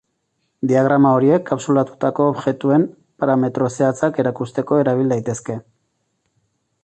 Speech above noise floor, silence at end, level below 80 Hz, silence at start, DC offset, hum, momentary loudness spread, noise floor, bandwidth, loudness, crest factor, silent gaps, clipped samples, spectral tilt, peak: 53 dB; 1.2 s; -60 dBFS; 0.65 s; under 0.1%; none; 11 LU; -70 dBFS; 8.8 kHz; -18 LUFS; 16 dB; none; under 0.1%; -7.5 dB/octave; -2 dBFS